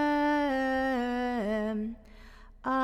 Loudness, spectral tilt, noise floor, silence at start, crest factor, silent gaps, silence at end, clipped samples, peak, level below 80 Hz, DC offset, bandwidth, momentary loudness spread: -30 LUFS; -6 dB/octave; -51 dBFS; 0 s; 12 dB; none; 0 s; under 0.1%; -18 dBFS; -52 dBFS; under 0.1%; 15.5 kHz; 12 LU